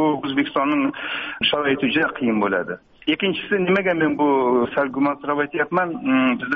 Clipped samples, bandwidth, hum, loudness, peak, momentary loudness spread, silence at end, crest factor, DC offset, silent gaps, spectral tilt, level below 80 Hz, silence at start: under 0.1%; 4.9 kHz; none; -20 LUFS; -6 dBFS; 5 LU; 0 s; 14 dB; under 0.1%; none; -3 dB/octave; -58 dBFS; 0 s